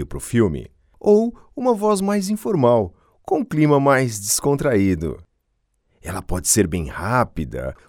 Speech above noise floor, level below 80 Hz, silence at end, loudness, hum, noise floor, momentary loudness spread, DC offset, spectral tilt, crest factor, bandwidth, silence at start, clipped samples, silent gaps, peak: 50 dB; -40 dBFS; 0.15 s; -19 LUFS; none; -69 dBFS; 12 LU; under 0.1%; -5 dB/octave; 18 dB; 19 kHz; 0 s; under 0.1%; none; -2 dBFS